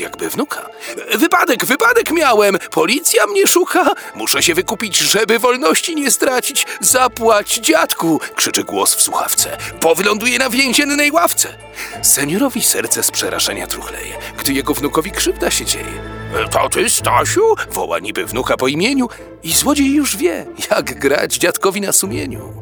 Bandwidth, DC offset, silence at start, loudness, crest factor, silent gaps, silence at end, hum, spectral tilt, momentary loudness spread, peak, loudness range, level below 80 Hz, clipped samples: over 20 kHz; under 0.1%; 0 s; -14 LUFS; 16 dB; none; 0 s; none; -2 dB/octave; 9 LU; 0 dBFS; 3 LU; -42 dBFS; under 0.1%